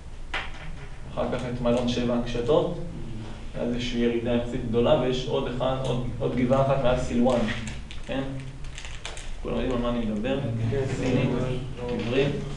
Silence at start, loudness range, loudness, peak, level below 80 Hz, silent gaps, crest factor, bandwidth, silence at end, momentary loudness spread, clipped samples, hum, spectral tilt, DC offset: 0 s; 4 LU; -27 LUFS; -8 dBFS; -36 dBFS; none; 18 dB; 11 kHz; 0 s; 14 LU; under 0.1%; none; -6.5 dB/octave; under 0.1%